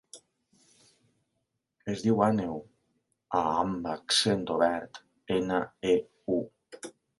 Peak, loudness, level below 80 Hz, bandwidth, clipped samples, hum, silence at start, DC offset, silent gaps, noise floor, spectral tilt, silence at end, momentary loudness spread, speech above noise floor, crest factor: -8 dBFS; -29 LUFS; -62 dBFS; 11.5 kHz; under 0.1%; none; 0.15 s; under 0.1%; none; -81 dBFS; -4.5 dB/octave; 0.3 s; 19 LU; 53 dB; 22 dB